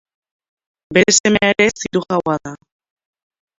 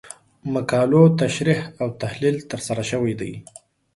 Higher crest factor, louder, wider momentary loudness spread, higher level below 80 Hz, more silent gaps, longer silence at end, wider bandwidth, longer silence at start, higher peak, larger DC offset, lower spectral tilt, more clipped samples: about the same, 18 dB vs 18 dB; first, -15 LUFS vs -21 LUFS; second, 10 LU vs 17 LU; first, -50 dBFS vs -56 dBFS; first, 1.20-1.24 s vs none; first, 1.05 s vs 0.55 s; second, 7.8 kHz vs 11.5 kHz; first, 0.9 s vs 0.05 s; about the same, 0 dBFS vs -2 dBFS; neither; second, -3 dB/octave vs -6.5 dB/octave; neither